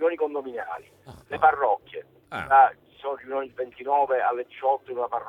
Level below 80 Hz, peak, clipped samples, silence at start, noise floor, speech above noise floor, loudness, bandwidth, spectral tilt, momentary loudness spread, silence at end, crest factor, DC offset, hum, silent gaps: -64 dBFS; -6 dBFS; under 0.1%; 0 s; -49 dBFS; 26 dB; -24 LUFS; 4.8 kHz; -6 dB/octave; 18 LU; 0 s; 18 dB; under 0.1%; none; none